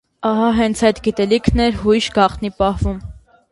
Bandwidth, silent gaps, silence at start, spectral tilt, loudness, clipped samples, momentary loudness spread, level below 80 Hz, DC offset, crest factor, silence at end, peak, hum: 11.5 kHz; none; 0.2 s; -5.5 dB/octave; -17 LUFS; under 0.1%; 5 LU; -30 dBFS; under 0.1%; 16 dB; 0.35 s; 0 dBFS; none